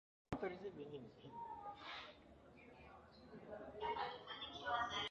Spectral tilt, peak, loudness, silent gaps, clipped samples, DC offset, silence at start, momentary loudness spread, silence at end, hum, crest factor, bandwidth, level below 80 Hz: -1.5 dB/octave; -26 dBFS; -48 LUFS; none; under 0.1%; under 0.1%; 0.3 s; 19 LU; 0 s; none; 24 dB; 8 kHz; -70 dBFS